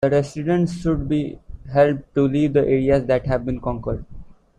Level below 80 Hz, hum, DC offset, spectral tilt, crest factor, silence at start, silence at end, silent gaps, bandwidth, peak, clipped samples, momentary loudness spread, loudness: -38 dBFS; none; under 0.1%; -8 dB/octave; 18 dB; 0 s; 0.25 s; none; 10.5 kHz; -2 dBFS; under 0.1%; 10 LU; -20 LUFS